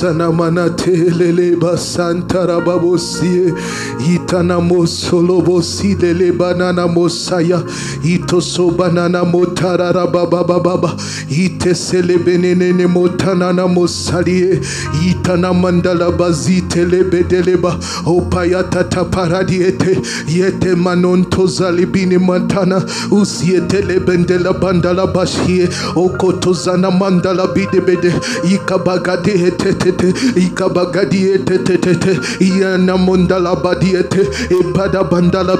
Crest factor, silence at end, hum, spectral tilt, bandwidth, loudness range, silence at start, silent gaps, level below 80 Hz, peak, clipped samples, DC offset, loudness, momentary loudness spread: 12 dB; 0 s; none; -6 dB/octave; 12 kHz; 1 LU; 0 s; none; -40 dBFS; 0 dBFS; under 0.1%; under 0.1%; -13 LUFS; 3 LU